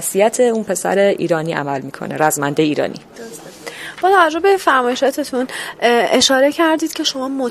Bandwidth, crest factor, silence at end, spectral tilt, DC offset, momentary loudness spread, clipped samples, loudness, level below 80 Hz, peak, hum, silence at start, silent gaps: 15.5 kHz; 16 dB; 0 s; -3.5 dB/octave; under 0.1%; 17 LU; under 0.1%; -16 LUFS; -58 dBFS; 0 dBFS; none; 0 s; none